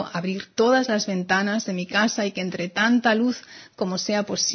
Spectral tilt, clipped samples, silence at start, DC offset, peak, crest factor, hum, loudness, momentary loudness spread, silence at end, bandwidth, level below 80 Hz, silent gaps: -3.5 dB/octave; under 0.1%; 0 s; under 0.1%; -6 dBFS; 16 dB; none; -23 LUFS; 9 LU; 0 s; 6.6 kHz; -68 dBFS; none